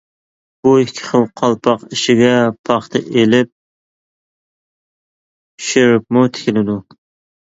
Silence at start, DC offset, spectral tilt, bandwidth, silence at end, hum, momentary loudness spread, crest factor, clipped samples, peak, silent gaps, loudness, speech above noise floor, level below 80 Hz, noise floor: 0.65 s; under 0.1%; -5 dB/octave; 8 kHz; 0.65 s; none; 6 LU; 16 dB; under 0.1%; 0 dBFS; 2.59-2.64 s, 3.52-5.58 s; -14 LUFS; over 77 dB; -56 dBFS; under -90 dBFS